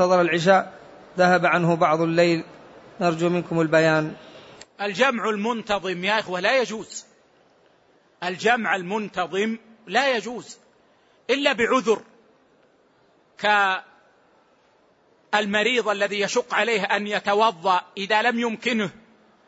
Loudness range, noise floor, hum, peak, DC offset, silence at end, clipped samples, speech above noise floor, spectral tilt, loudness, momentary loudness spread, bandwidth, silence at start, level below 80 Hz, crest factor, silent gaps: 5 LU; -60 dBFS; none; -6 dBFS; under 0.1%; 0.55 s; under 0.1%; 38 dB; -4.5 dB/octave; -22 LUFS; 12 LU; 8 kHz; 0 s; -66 dBFS; 18 dB; none